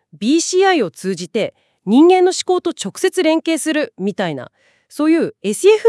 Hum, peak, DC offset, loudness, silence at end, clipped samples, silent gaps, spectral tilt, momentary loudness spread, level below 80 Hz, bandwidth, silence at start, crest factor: none; 0 dBFS; under 0.1%; -16 LUFS; 0 s; under 0.1%; none; -4 dB/octave; 12 LU; -72 dBFS; 12 kHz; 0.15 s; 14 dB